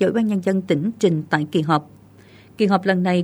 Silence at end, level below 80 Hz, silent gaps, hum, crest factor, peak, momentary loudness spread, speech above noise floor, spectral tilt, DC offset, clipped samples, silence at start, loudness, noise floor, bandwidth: 0 s; -64 dBFS; none; none; 18 dB; -2 dBFS; 4 LU; 28 dB; -7 dB/octave; under 0.1%; under 0.1%; 0 s; -20 LUFS; -47 dBFS; 19 kHz